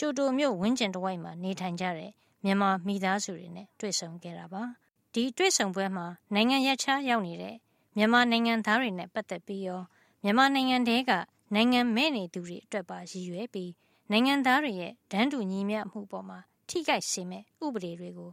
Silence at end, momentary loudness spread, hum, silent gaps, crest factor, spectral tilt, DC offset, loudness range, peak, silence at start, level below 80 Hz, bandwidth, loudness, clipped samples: 0 s; 16 LU; none; none; 20 dB; -3.5 dB/octave; under 0.1%; 5 LU; -8 dBFS; 0 s; -74 dBFS; 16 kHz; -29 LUFS; under 0.1%